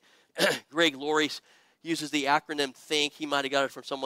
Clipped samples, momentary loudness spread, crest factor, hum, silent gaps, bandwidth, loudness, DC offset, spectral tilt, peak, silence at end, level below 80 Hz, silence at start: under 0.1%; 8 LU; 20 dB; none; none; 16 kHz; -28 LUFS; under 0.1%; -2.5 dB/octave; -8 dBFS; 0 s; -74 dBFS; 0.35 s